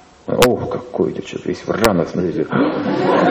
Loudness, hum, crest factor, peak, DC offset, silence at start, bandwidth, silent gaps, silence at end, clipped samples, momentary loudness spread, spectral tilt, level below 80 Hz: -18 LUFS; none; 18 dB; 0 dBFS; under 0.1%; 0.25 s; 13 kHz; none; 0 s; under 0.1%; 9 LU; -5.5 dB/octave; -42 dBFS